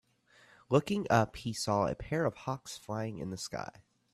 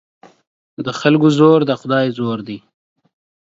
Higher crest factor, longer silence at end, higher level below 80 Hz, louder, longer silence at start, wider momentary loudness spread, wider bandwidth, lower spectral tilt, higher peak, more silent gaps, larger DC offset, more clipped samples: first, 22 dB vs 16 dB; second, 0.45 s vs 1 s; about the same, -60 dBFS vs -62 dBFS; second, -33 LUFS vs -15 LUFS; about the same, 0.7 s vs 0.8 s; second, 11 LU vs 16 LU; first, 14 kHz vs 7.8 kHz; second, -5.5 dB/octave vs -7 dB/octave; second, -12 dBFS vs 0 dBFS; neither; neither; neither